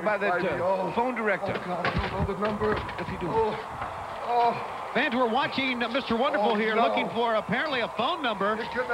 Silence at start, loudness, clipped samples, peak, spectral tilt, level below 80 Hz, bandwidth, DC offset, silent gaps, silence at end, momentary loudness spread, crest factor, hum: 0 s; -27 LUFS; under 0.1%; -12 dBFS; -6 dB/octave; -48 dBFS; 15.5 kHz; under 0.1%; none; 0 s; 6 LU; 14 dB; none